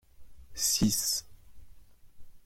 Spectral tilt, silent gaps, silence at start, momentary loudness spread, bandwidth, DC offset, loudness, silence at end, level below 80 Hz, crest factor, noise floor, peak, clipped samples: -2.5 dB/octave; none; 0.2 s; 9 LU; 16.5 kHz; under 0.1%; -28 LUFS; 0.05 s; -54 dBFS; 20 dB; -51 dBFS; -14 dBFS; under 0.1%